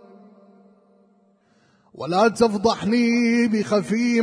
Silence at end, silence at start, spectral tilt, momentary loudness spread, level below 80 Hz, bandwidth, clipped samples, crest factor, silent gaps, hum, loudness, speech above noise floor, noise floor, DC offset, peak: 0 s; 2 s; -5.5 dB/octave; 4 LU; -58 dBFS; 10.5 kHz; under 0.1%; 16 dB; none; none; -20 LUFS; 41 dB; -60 dBFS; under 0.1%; -6 dBFS